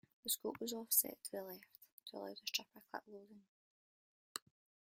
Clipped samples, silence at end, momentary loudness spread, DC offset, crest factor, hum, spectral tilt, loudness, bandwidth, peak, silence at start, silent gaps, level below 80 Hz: under 0.1%; 0.6 s; 22 LU; under 0.1%; 28 dB; none; -1 dB/octave; -41 LUFS; 16 kHz; -18 dBFS; 0.25 s; 1.92-1.98 s, 3.48-4.35 s; -90 dBFS